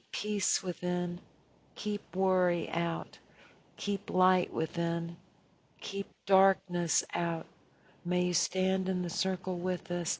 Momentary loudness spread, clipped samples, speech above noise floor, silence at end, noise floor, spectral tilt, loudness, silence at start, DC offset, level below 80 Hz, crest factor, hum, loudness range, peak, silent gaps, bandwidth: 12 LU; under 0.1%; 34 dB; 0 s; -66 dBFS; -4.5 dB/octave; -32 LUFS; 0.15 s; under 0.1%; -70 dBFS; 20 dB; none; 3 LU; -12 dBFS; none; 8 kHz